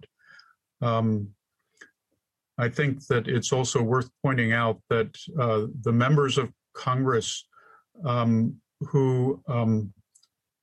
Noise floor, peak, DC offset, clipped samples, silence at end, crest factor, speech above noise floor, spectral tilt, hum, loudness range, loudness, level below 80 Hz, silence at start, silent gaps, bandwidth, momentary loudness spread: -80 dBFS; -8 dBFS; under 0.1%; under 0.1%; 0.7 s; 18 dB; 55 dB; -6 dB/octave; none; 3 LU; -26 LUFS; -60 dBFS; 0.8 s; none; 10.5 kHz; 9 LU